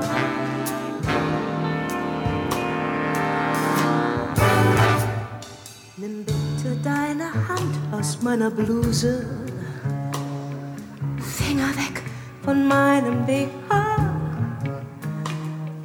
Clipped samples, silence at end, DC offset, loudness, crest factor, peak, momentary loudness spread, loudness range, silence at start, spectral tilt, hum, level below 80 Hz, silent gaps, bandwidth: under 0.1%; 0 s; under 0.1%; -23 LUFS; 18 dB; -6 dBFS; 13 LU; 5 LU; 0 s; -6 dB/octave; none; -44 dBFS; none; 19.5 kHz